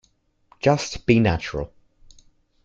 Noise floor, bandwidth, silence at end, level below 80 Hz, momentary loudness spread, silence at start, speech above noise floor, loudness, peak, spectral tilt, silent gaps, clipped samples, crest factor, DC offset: -64 dBFS; 7.8 kHz; 1 s; -44 dBFS; 13 LU; 0.65 s; 44 dB; -22 LUFS; -2 dBFS; -6 dB/octave; none; under 0.1%; 22 dB; under 0.1%